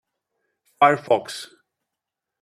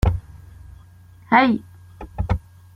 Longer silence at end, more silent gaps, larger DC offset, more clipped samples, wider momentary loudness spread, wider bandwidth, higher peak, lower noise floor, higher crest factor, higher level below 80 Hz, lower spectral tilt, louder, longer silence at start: first, 0.95 s vs 0.35 s; neither; neither; neither; about the same, 18 LU vs 19 LU; about the same, 13.5 kHz vs 14.5 kHz; about the same, -4 dBFS vs -2 dBFS; first, -85 dBFS vs -47 dBFS; about the same, 22 dB vs 20 dB; second, -76 dBFS vs -32 dBFS; second, -4.5 dB/octave vs -7.5 dB/octave; about the same, -20 LUFS vs -21 LUFS; first, 0.8 s vs 0.05 s